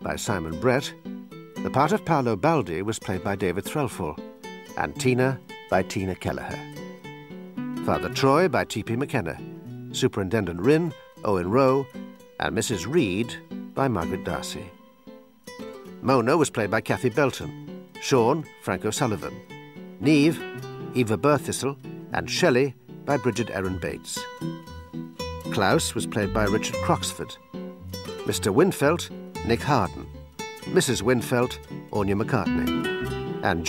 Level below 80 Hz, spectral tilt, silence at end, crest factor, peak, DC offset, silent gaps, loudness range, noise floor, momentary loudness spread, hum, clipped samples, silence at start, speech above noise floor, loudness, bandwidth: -50 dBFS; -5 dB/octave; 0 s; 20 dB; -6 dBFS; under 0.1%; none; 3 LU; -48 dBFS; 17 LU; none; under 0.1%; 0 s; 24 dB; -25 LUFS; 16 kHz